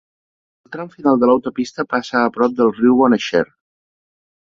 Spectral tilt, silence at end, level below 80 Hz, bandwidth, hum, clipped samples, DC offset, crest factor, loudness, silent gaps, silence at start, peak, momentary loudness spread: -6 dB/octave; 1.05 s; -56 dBFS; 7.4 kHz; none; under 0.1%; under 0.1%; 16 dB; -16 LUFS; none; 0.7 s; -2 dBFS; 14 LU